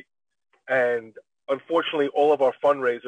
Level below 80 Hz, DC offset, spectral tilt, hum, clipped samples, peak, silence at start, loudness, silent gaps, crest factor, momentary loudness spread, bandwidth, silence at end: -76 dBFS; under 0.1%; -5.5 dB/octave; none; under 0.1%; -8 dBFS; 0.7 s; -23 LUFS; none; 16 dB; 10 LU; 9.4 kHz; 0 s